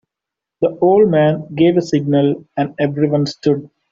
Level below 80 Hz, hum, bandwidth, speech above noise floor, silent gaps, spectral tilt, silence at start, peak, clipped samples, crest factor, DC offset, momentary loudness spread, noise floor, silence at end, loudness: -56 dBFS; none; 7.6 kHz; 69 dB; none; -7.5 dB/octave; 0.6 s; -2 dBFS; under 0.1%; 14 dB; under 0.1%; 9 LU; -84 dBFS; 0.25 s; -16 LUFS